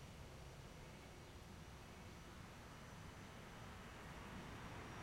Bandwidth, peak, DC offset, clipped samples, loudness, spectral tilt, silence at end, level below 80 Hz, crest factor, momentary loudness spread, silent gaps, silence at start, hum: 16 kHz; -40 dBFS; under 0.1%; under 0.1%; -57 LUFS; -4.5 dB/octave; 0 s; -64 dBFS; 14 dB; 4 LU; none; 0 s; none